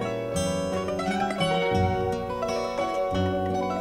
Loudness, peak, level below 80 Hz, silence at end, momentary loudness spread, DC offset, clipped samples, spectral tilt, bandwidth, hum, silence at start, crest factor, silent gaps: -27 LUFS; -12 dBFS; -46 dBFS; 0 s; 4 LU; under 0.1%; under 0.1%; -5.5 dB/octave; 16 kHz; none; 0 s; 14 dB; none